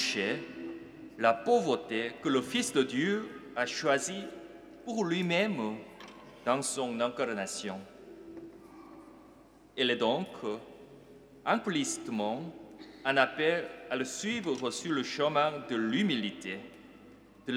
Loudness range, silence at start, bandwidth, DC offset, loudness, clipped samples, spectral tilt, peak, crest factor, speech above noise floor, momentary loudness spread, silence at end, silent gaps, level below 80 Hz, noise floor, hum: 5 LU; 0 s; 16 kHz; under 0.1%; -32 LUFS; under 0.1%; -3.5 dB/octave; -10 dBFS; 24 dB; 26 dB; 20 LU; 0 s; none; -72 dBFS; -57 dBFS; none